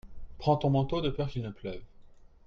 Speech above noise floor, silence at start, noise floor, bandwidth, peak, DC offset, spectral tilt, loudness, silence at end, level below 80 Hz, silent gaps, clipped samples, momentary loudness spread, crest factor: 23 dB; 0.05 s; -53 dBFS; 6.6 kHz; -12 dBFS; under 0.1%; -8.5 dB/octave; -31 LUFS; 0.2 s; -48 dBFS; none; under 0.1%; 15 LU; 18 dB